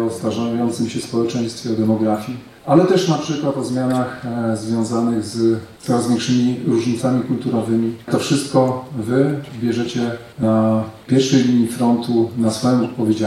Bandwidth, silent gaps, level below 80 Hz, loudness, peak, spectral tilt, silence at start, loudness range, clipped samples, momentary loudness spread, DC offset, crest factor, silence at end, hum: 14 kHz; none; -56 dBFS; -19 LUFS; -2 dBFS; -6 dB/octave; 0 s; 2 LU; under 0.1%; 7 LU; under 0.1%; 16 dB; 0 s; none